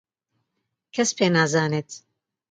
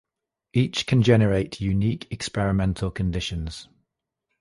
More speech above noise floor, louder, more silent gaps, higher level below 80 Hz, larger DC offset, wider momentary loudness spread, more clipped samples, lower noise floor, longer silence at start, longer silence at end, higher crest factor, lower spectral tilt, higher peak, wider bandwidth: second, 57 dB vs 61 dB; about the same, -22 LUFS vs -24 LUFS; neither; second, -68 dBFS vs -40 dBFS; neither; first, 19 LU vs 12 LU; neither; second, -79 dBFS vs -84 dBFS; first, 0.95 s vs 0.55 s; second, 0.55 s vs 0.75 s; about the same, 18 dB vs 20 dB; second, -4 dB/octave vs -6.5 dB/octave; second, -8 dBFS vs -4 dBFS; second, 9.4 kHz vs 11.5 kHz